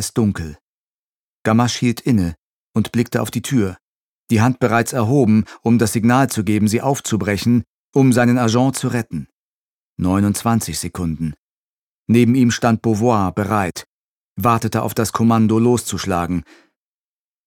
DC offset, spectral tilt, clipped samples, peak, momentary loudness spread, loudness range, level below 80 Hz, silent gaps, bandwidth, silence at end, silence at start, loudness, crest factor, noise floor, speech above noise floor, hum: under 0.1%; -6 dB/octave; under 0.1%; 0 dBFS; 10 LU; 4 LU; -46 dBFS; 0.61-1.45 s, 2.38-2.74 s, 3.81-4.27 s, 7.67-7.93 s, 9.33-9.96 s, 11.38-12.06 s, 13.86-14.36 s; 17 kHz; 1.05 s; 0 s; -17 LUFS; 16 dB; under -90 dBFS; over 74 dB; none